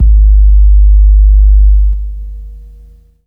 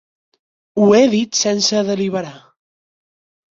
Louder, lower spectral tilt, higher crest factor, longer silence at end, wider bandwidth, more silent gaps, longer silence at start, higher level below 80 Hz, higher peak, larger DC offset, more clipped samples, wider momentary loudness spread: first, -9 LUFS vs -15 LUFS; first, -12 dB/octave vs -4 dB/octave; second, 6 dB vs 16 dB; second, 0.7 s vs 1.15 s; second, 0.2 kHz vs 7.8 kHz; neither; second, 0 s vs 0.75 s; first, -6 dBFS vs -60 dBFS; about the same, 0 dBFS vs -2 dBFS; neither; neither; first, 17 LU vs 14 LU